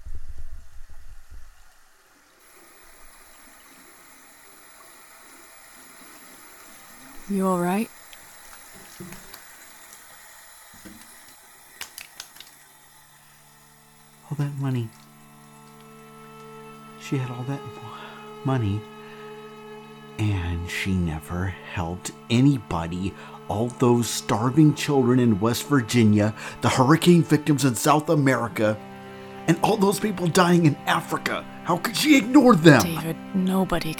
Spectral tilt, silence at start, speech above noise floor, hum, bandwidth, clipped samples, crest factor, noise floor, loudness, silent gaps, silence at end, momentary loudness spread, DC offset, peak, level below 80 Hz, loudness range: -5.5 dB/octave; 0 s; 35 dB; none; over 20 kHz; under 0.1%; 24 dB; -56 dBFS; -22 LUFS; none; 0 s; 26 LU; under 0.1%; 0 dBFS; -48 dBFS; 23 LU